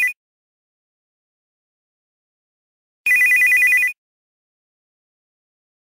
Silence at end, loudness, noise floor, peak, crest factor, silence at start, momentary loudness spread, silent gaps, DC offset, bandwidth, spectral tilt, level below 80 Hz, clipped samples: 1.9 s; -14 LUFS; under -90 dBFS; -10 dBFS; 14 dB; 0 s; 10 LU; 0.16-3.04 s; under 0.1%; 16.5 kHz; 2.5 dB/octave; -74 dBFS; under 0.1%